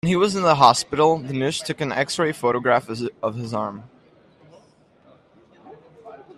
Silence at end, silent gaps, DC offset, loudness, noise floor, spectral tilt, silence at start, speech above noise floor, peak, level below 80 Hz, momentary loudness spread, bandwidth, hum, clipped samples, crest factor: 0.15 s; none; under 0.1%; -21 LUFS; -55 dBFS; -4.5 dB/octave; 0.05 s; 35 dB; 0 dBFS; -58 dBFS; 13 LU; 13.5 kHz; none; under 0.1%; 22 dB